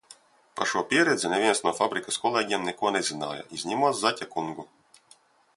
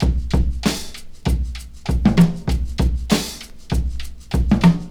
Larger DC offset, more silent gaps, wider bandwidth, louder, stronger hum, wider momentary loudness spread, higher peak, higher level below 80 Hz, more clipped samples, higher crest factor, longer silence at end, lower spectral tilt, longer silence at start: second, under 0.1% vs 0.1%; neither; second, 11.5 kHz vs 17 kHz; second, -26 LUFS vs -20 LUFS; neither; second, 11 LU vs 14 LU; second, -6 dBFS vs -2 dBFS; second, -70 dBFS vs -24 dBFS; neither; about the same, 20 dB vs 18 dB; first, 0.9 s vs 0 s; second, -2.5 dB/octave vs -6 dB/octave; about the same, 0.1 s vs 0 s